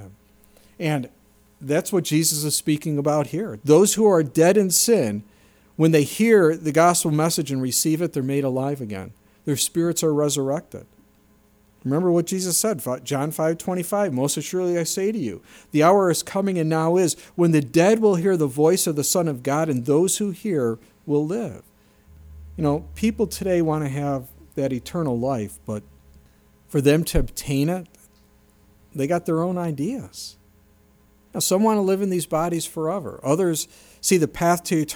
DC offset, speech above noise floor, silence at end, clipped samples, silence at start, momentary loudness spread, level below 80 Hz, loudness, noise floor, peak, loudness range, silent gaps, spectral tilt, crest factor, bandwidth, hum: under 0.1%; 36 dB; 0 s; under 0.1%; 0 s; 13 LU; -44 dBFS; -21 LUFS; -57 dBFS; -4 dBFS; 7 LU; none; -5 dB/octave; 18 dB; over 20 kHz; none